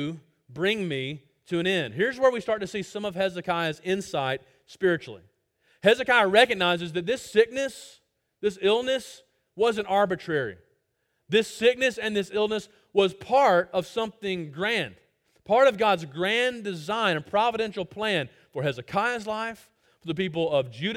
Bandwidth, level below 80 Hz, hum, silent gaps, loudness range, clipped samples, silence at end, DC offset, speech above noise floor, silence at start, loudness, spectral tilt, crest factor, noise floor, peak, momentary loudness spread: 16 kHz; -64 dBFS; none; none; 4 LU; under 0.1%; 0 s; under 0.1%; 50 dB; 0 s; -25 LUFS; -4.5 dB/octave; 22 dB; -75 dBFS; -4 dBFS; 12 LU